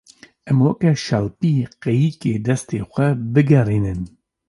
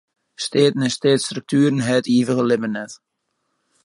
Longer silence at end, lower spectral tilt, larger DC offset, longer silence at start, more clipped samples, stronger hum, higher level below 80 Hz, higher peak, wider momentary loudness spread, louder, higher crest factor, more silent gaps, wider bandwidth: second, 0.4 s vs 0.9 s; first, -7.5 dB/octave vs -5 dB/octave; neither; about the same, 0.45 s vs 0.4 s; neither; neither; first, -44 dBFS vs -66 dBFS; about the same, -2 dBFS vs -4 dBFS; about the same, 8 LU vs 10 LU; about the same, -19 LUFS vs -19 LUFS; about the same, 16 dB vs 16 dB; neither; about the same, 11.5 kHz vs 11.5 kHz